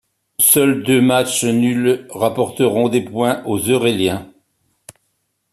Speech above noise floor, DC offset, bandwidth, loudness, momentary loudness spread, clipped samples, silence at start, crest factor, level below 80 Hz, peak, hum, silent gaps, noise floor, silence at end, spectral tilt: 53 dB; under 0.1%; 14.5 kHz; -16 LUFS; 8 LU; under 0.1%; 0.4 s; 18 dB; -58 dBFS; 0 dBFS; none; none; -69 dBFS; 1.25 s; -4 dB/octave